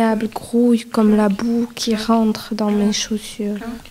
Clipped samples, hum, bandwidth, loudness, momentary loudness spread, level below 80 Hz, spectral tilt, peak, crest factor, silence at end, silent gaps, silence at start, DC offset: under 0.1%; none; 15.5 kHz; -18 LUFS; 9 LU; -46 dBFS; -5 dB/octave; -4 dBFS; 12 dB; 0 s; none; 0 s; under 0.1%